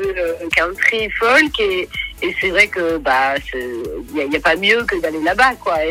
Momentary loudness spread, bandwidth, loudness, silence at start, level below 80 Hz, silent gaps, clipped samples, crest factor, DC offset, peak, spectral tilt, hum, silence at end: 11 LU; 18.5 kHz; -16 LUFS; 0 s; -40 dBFS; none; under 0.1%; 14 dB; under 0.1%; -2 dBFS; -3.5 dB/octave; none; 0 s